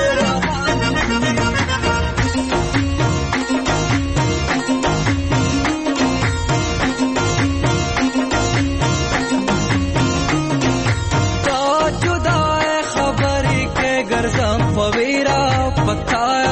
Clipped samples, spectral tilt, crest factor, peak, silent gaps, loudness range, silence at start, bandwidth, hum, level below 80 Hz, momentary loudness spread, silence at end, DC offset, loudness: under 0.1%; -5 dB/octave; 12 dB; -6 dBFS; none; 1 LU; 0 s; 8.8 kHz; none; -30 dBFS; 2 LU; 0 s; under 0.1%; -17 LUFS